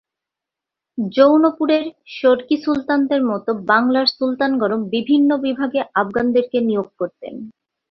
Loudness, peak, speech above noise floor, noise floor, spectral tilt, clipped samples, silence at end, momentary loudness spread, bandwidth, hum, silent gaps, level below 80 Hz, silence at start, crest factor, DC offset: -18 LUFS; -2 dBFS; 68 dB; -85 dBFS; -7 dB/octave; under 0.1%; 0.4 s; 12 LU; 6 kHz; none; none; -60 dBFS; 0.95 s; 16 dB; under 0.1%